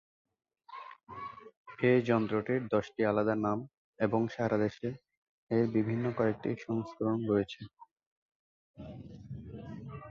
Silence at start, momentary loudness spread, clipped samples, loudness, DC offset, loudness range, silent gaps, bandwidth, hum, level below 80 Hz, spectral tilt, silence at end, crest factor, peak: 0.7 s; 19 LU; under 0.1%; -32 LUFS; under 0.1%; 6 LU; 1.57-1.65 s, 3.77-3.93 s, 5.17-5.47 s, 7.91-7.96 s, 8.07-8.29 s, 8.35-8.74 s; 7.2 kHz; none; -64 dBFS; -8.5 dB/octave; 0 s; 20 dB; -14 dBFS